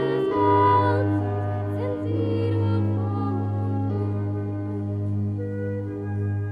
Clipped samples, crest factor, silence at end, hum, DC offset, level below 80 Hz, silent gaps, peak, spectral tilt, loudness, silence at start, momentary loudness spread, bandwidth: under 0.1%; 16 dB; 0 s; 50 Hz at -45 dBFS; under 0.1%; -56 dBFS; none; -8 dBFS; -10 dB/octave; -25 LUFS; 0 s; 10 LU; 4.9 kHz